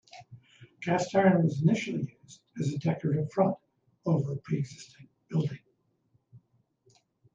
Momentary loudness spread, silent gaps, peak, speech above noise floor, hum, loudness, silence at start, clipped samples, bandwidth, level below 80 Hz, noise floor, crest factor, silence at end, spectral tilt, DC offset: 23 LU; none; -12 dBFS; 45 dB; none; -29 LUFS; 0.15 s; under 0.1%; 7.8 kHz; -70 dBFS; -73 dBFS; 20 dB; 0.95 s; -7.5 dB/octave; under 0.1%